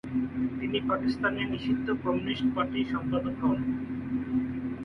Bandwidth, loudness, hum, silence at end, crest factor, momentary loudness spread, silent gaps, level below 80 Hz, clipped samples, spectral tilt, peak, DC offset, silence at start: 5.8 kHz; -30 LUFS; none; 0 s; 14 dB; 4 LU; none; -52 dBFS; under 0.1%; -8 dB/octave; -14 dBFS; under 0.1%; 0.05 s